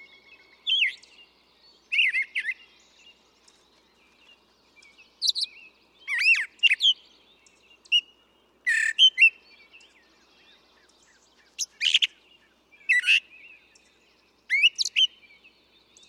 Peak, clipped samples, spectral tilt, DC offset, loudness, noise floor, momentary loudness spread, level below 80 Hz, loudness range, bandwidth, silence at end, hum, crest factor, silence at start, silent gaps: -6 dBFS; under 0.1%; 4.5 dB/octave; under 0.1%; -22 LUFS; -63 dBFS; 15 LU; -78 dBFS; 8 LU; 16.5 kHz; 1.05 s; none; 22 dB; 0.65 s; none